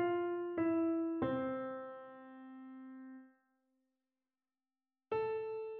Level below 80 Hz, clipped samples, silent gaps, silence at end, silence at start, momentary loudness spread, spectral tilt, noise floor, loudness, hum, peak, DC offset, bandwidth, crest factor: -76 dBFS; under 0.1%; none; 0 s; 0 s; 19 LU; -6 dB/octave; under -90 dBFS; -38 LUFS; none; -24 dBFS; under 0.1%; 4.3 kHz; 16 dB